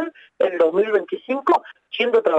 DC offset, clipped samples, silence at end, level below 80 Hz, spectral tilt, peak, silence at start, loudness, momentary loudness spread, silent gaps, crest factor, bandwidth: under 0.1%; under 0.1%; 0 s; -78 dBFS; -5.5 dB/octave; -6 dBFS; 0 s; -20 LUFS; 9 LU; none; 14 dB; 8 kHz